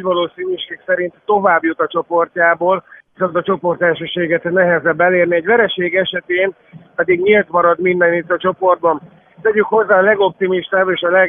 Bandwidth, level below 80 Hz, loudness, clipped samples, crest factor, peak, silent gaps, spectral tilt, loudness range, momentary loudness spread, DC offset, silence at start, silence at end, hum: 3.7 kHz; -58 dBFS; -15 LUFS; under 0.1%; 14 dB; 0 dBFS; none; -9 dB/octave; 2 LU; 7 LU; under 0.1%; 0 s; 0 s; none